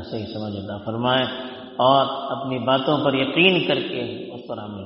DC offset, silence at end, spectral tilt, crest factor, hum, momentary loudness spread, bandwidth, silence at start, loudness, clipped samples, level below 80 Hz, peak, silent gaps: under 0.1%; 0 s; -3 dB/octave; 22 dB; none; 16 LU; 5.8 kHz; 0 s; -21 LUFS; under 0.1%; -60 dBFS; 0 dBFS; none